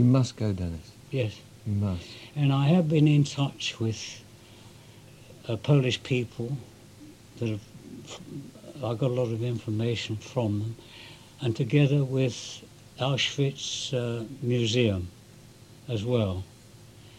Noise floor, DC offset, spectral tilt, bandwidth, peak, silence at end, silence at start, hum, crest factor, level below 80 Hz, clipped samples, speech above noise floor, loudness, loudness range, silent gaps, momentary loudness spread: -51 dBFS; under 0.1%; -6 dB/octave; 12 kHz; -10 dBFS; 0 s; 0 s; none; 18 dB; -58 dBFS; under 0.1%; 24 dB; -28 LUFS; 5 LU; none; 20 LU